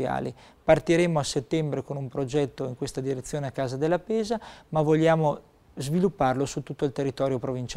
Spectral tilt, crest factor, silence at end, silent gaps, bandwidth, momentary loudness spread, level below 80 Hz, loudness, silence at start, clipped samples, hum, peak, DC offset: -6 dB/octave; 20 dB; 0 s; none; 14.5 kHz; 11 LU; -52 dBFS; -27 LUFS; 0 s; under 0.1%; none; -6 dBFS; under 0.1%